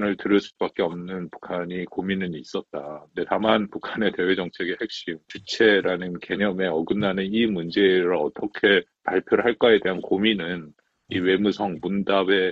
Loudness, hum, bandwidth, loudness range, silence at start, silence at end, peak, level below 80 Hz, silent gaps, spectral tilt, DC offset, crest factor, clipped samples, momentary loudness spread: -23 LUFS; none; 7.8 kHz; 6 LU; 0 s; 0 s; -4 dBFS; -60 dBFS; none; -6 dB/octave; under 0.1%; 20 dB; under 0.1%; 13 LU